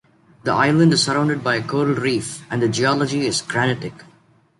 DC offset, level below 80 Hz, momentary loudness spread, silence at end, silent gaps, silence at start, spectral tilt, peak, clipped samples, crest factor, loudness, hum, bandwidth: under 0.1%; -56 dBFS; 10 LU; 0.55 s; none; 0.45 s; -5 dB/octave; -4 dBFS; under 0.1%; 16 dB; -19 LUFS; none; 11.5 kHz